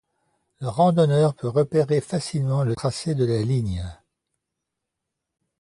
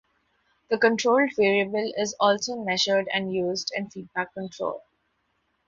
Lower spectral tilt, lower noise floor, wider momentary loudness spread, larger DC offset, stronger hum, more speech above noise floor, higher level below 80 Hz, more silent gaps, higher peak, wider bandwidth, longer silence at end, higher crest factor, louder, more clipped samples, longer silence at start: first, -7 dB/octave vs -3.5 dB/octave; first, -83 dBFS vs -73 dBFS; about the same, 11 LU vs 11 LU; neither; neither; first, 61 dB vs 48 dB; first, -46 dBFS vs -68 dBFS; neither; about the same, -8 dBFS vs -8 dBFS; first, 11.5 kHz vs 7.8 kHz; first, 1.65 s vs 0.9 s; about the same, 16 dB vs 18 dB; first, -22 LUFS vs -25 LUFS; neither; about the same, 0.6 s vs 0.7 s